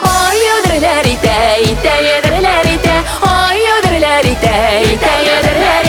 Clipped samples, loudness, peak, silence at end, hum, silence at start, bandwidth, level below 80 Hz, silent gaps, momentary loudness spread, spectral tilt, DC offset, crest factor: under 0.1%; -10 LUFS; 0 dBFS; 0 s; none; 0 s; over 20 kHz; -24 dBFS; none; 1 LU; -4 dB/octave; under 0.1%; 10 dB